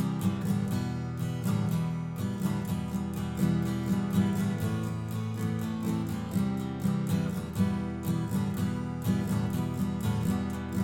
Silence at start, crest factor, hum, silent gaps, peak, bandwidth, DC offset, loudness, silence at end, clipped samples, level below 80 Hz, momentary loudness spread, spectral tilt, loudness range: 0 s; 14 dB; none; none; -16 dBFS; 17 kHz; under 0.1%; -31 LUFS; 0 s; under 0.1%; -50 dBFS; 5 LU; -7 dB/octave; 1 LU